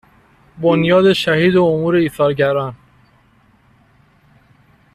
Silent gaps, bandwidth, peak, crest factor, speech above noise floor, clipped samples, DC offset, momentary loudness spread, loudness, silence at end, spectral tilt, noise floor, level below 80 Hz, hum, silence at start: none; 13.5 kHz; -2 dBFS; 14 dB; 39 dB; under 0.1%; under 0.1%; 7 LU; -14 LUFS; 2.2 s; -7 dB/octave; -53 dBFS; -52 dBFS; none; 0.55 s